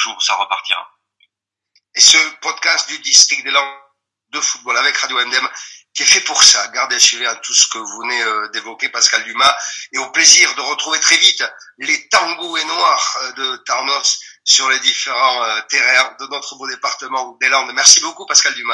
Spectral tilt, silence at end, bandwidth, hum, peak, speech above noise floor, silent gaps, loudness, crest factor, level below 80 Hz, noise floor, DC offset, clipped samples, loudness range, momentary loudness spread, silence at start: 3 dB/octave; 0 s; 12 kHz; none; 0 dBFS; 60 dB; none; -12 LUFS; 16 dB; -66 dBFS; -75 dBFS; under 0.1%; 0.2%; 3 LU; 15 LU; 0 s